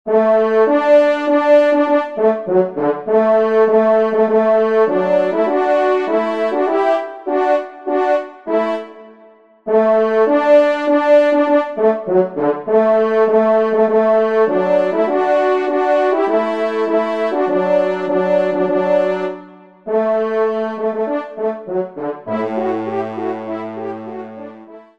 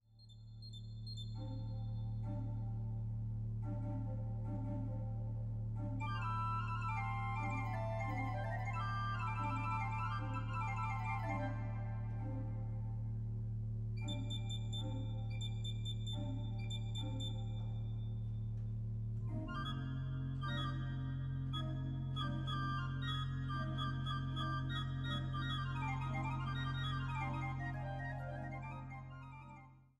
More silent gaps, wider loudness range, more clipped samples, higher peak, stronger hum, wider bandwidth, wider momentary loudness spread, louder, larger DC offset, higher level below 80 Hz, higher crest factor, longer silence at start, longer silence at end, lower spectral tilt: neither; first, 6 LU vs 3 LU; neither; first, -2 dBFS vs -28 dBFS; neither; about the same, 7.6 kHz vs 7.8 kHz; first, 11 LU vs 5 LU; first, -15 LUFS vs -42 LUFS; first, 0.3% vs under 0.1%; second, -66 dBFS vs -50 dBFS; about the same, 14 dB vs 14 dB; about the same, 0.05 s vs 0.1 s; about the same, 0.2 s vs 0.15 s; about the same, -7 dB/octave vs -6.5 dB/octave